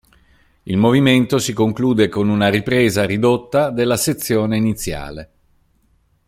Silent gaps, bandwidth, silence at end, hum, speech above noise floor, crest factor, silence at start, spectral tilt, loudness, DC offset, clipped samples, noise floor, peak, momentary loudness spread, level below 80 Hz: none; 16 kHz; 1.05 s; none; 43 dB; 16 dB; 0.65 s; -5.5 dB/octave; -16 LUFS; under 0.1%; under 0.1%; -59 dBFS; -2 dBFS; 11 LU; -44 dBFS